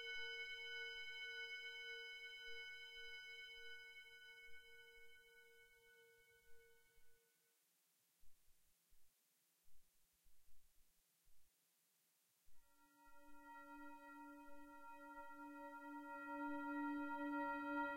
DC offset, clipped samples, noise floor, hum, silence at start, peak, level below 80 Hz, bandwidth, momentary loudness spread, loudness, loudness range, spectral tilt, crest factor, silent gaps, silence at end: under 0.1%; under 0.1%; -82 dBFS; none; 0 s; -34 dBFS; -80 dBFS; 16 kHz; 20 LU; -52 LUFS; 16 LU; -2.5 dB/octave; 20 dB; none; 0 s